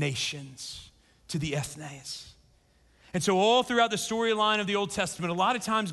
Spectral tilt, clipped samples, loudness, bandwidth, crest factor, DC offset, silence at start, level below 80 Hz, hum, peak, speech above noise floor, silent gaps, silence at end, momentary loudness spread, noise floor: -4 dB/octave; under 0.1%; -27 LUFS; 12.5 kHz; 18 dB; under 0.1%; 0 s; -60 dBFS; none; -12 dBFS; 35 dB; none; 0 s; 17 LU; -63 dBFS